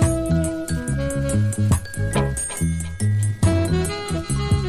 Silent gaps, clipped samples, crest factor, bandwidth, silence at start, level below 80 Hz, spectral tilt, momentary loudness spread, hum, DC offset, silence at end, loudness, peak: none; under 0.1%; 14 dB; 14.5 kHz; 0 s; -30 dBFS; -6 dB/octave; 5 LU; none; under 0.1%; 0 s; -22 LUFS; -6 dBFS